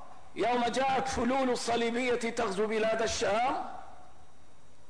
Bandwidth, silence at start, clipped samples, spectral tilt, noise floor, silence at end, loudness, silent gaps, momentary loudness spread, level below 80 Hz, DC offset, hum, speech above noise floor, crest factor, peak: 10.5 kHz; 0 s; under 0.1%; -3.5 dB/octave; -61 dBFS; 0.85 s; -30 LUFS; none; 6 LU; -56 dBFS; 0.8%; none; 31 dB; 12 dB; -20 dBFS